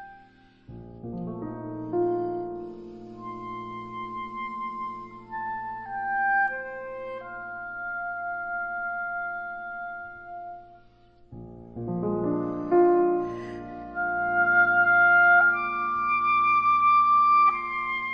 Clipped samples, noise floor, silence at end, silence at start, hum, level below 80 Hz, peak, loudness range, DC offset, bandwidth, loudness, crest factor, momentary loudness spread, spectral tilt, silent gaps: under 0.1%; -55 dBFS; 0 s; 0 s; none; -58 dBFS; -10 dBFS; 15 LU; under 0.1%; 6 kHz; -24 LUFS; 16 dB; 20 LU; -8 dB/octave; none